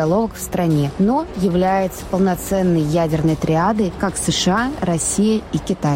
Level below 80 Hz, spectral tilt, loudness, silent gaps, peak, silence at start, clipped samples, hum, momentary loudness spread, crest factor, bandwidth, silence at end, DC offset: -38 dBFS; -5.5 dB/octave; -18 LUFS; none; -8 dBFS; 0 s; under 0.1%; none; 4 LU; 10 dB; 16.5 kHz; 0 s; under 0.1%